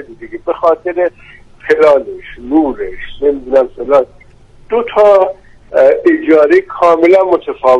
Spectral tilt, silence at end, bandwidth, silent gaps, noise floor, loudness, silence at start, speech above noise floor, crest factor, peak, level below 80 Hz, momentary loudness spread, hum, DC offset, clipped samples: -6 dB/octave; 0 s; 9 kHz; none; -40 dBFS; -11 LUFS; 0 s; 29 dB; 12 dB; 0 dBFS; -40 dBFS; 15 LU; none; under 0.1%; 0.1%